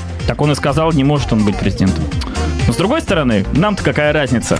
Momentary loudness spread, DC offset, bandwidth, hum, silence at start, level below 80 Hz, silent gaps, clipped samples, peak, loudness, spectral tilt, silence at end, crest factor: 5 LU; under 0.1%; 11 kHz; none; 0 s; -26 dBFS; none; under 0.1%; -2 dBFS; -15 LUFS; -6 dB/octave; 0 s; 12 dB